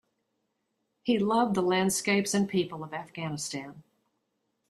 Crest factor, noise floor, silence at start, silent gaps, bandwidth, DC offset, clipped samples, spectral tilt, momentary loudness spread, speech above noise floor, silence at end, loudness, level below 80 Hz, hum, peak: 18 dB; -79 dBFS; 1.05 s; none; 15 kHz; under 0.1%; under 0.1%; -4.5 dB/octave; 13 LU; 51 dB; 0.9 s; -28 LUFS; -68 dBFS; none; -12 dBFS